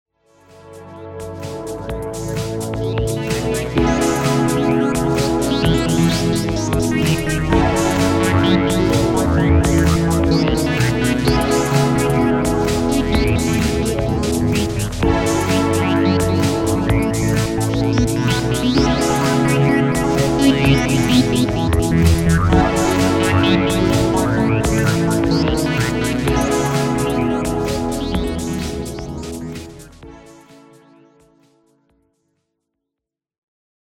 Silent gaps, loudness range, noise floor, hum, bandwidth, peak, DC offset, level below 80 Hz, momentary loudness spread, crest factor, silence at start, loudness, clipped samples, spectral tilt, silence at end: none; 8 LU; -84 dBFS; none; 16.5 kHz; -2 dBFS; under 0.1%; -28 dBFS; 9 LU; 16 dB; 0.65 s; -17 LUFS; under 0.1%; -5.5 dB/octave; 3.5 s